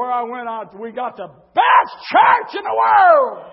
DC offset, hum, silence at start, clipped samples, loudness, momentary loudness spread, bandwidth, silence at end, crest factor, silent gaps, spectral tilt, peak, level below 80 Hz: under 0.1%; none; 0 s; under 0.1%; -14 LUFS; 16 LU; 5.8 kHz; 0.05 s; 16 dB; none; -7 dB/octave; 0 dBFS; -68 dBFS